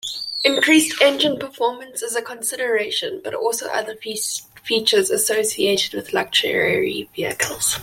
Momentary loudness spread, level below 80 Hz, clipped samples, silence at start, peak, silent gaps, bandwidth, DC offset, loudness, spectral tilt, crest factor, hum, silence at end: 10 LU; -60 dBFS; under 0.1%; 0.05 s; -2 dBFS; none; 16.5 kHz; under 0.1%; -19 LUFS; -1.5 dB/octave; 18 dB; none; 0 s